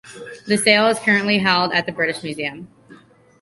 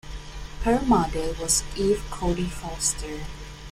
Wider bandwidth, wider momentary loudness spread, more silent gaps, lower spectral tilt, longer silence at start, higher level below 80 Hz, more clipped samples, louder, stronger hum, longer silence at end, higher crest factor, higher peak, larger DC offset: second, 11.5 kHz vs 16 kHz; second, 13 LU vs 17 LU; neither; about the same, -3.5 dB/octave vs -4 dB/octave; about the same, 0.05 s vs 0.05 s; second, -60 dBFS vs -36 dBFS; neither; first, -18 LUFS vs -25 LUFS; neither; first, 0.45 s vs 0 s; about the same, 20 dB vs 18 dB; first, 0 dBFS vs -8 dBFS; neither